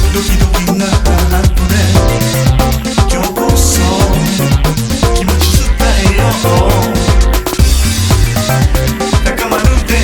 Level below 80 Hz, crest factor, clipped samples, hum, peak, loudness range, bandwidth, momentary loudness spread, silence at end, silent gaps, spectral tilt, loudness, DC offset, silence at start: -14 dBFS; 10 dB; 0.5%; none; 0 dBFS; 1 LU; 19.5 kHz; 3 LU; 0 s; none; -5 dB/octave; -11 LUFS; under 0.1%; 0 s